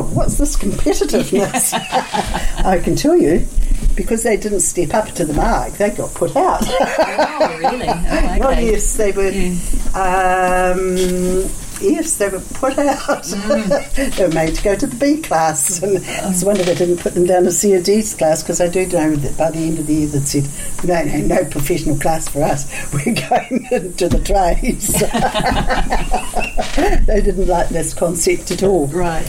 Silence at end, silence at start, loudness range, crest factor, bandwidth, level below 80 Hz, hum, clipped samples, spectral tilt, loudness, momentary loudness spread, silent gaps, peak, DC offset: 0 s; 0 s; 3 LU; 12 dB; 16.5 kHz; -22 dBFS; none; under 0.1%; -4.5 dB/octave; -17 LUFS; 6 LU; none; -4 dBFS; under 0.1%